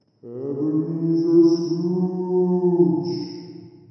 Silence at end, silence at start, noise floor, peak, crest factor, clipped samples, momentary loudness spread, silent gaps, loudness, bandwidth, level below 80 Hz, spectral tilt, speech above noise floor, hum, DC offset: 0.2 s; 0.25 s; -41 dBFS; -6 dBFS; 16 dB; under 0.1%; 17 LU; none; -21 LUFS; 6.2 kHz; -76 dBFS; -9.5 dB/octave; 20 dB; none; under 0.1%